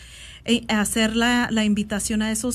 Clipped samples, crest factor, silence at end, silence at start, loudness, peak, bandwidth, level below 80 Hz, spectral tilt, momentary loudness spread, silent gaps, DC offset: under 0.1%; 14 dB; 0 s; 0 s; -21 LUFS; -8 dBFS; 14 kHz; -44 dBFS; -3.5 dB/octave; 4 LU; none; under 0.1%